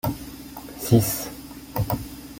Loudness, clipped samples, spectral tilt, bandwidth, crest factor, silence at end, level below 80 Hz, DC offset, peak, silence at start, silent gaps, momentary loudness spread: -25 LUFS; under 0.1%; -6 dB/octave; 17 kHz; 22 dB; 0 s; -44 dBFS; under 0.1%; -4 dBFS; 0.05 s; none; 18 LU